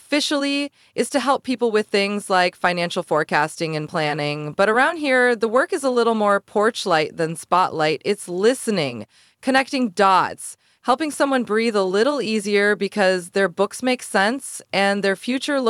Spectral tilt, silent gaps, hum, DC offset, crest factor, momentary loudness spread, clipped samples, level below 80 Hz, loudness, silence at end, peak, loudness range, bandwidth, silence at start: -4 dB/octave; none; none; under 0.1%; 18 dB; 7 LU; under 0.1%; -72 dBFS; -20 LUFS; 0 s; -2 dBFS; 2 LU; 15 kHz; 0.1 s